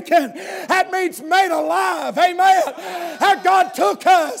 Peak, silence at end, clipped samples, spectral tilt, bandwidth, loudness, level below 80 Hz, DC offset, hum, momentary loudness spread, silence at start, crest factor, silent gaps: -4 dBFS; 0 s; under 0.1%; -2 dB/octave; 16 kHz; -17 LUFS; -80 dBFS; under 0.1%; none; 10 LU; 0 s; 14 dB; none